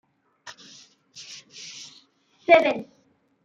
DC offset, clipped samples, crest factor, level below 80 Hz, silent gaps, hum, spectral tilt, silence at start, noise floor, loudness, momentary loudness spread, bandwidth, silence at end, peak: under 0.1%; under 0.1%; 24 dB; -74 dBFS; none; none; -3 dB/octave; 0.45 s; -60 dBFS; -20 LUFS; 28 LU; 7.8 kHz; 0.6 s; -2 dBFS